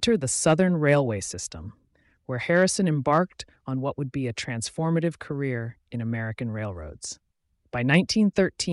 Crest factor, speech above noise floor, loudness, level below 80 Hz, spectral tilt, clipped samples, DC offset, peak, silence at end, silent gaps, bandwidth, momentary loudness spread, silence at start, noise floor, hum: 16 dB; 28 dB; -25 LUFS; -54 dBFS; -5 dB/octave; under 0.1%; under 0.1%; -8 dBFS; 0 s; none; 11.5 kHz; 15 LU; 0 s; -53 dBFS; none